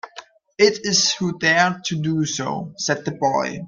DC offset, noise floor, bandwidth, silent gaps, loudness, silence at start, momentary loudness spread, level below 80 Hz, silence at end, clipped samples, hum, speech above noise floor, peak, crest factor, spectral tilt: under 0.1%; -44 dBFS; 9.4 kHz; none; -20 LUFS; 0.05 s; 9 LU; -62 dBFS; 0 s; under 0.1%; none; 23 dB; -2 dBFS; 18 dB; -3 dB/octave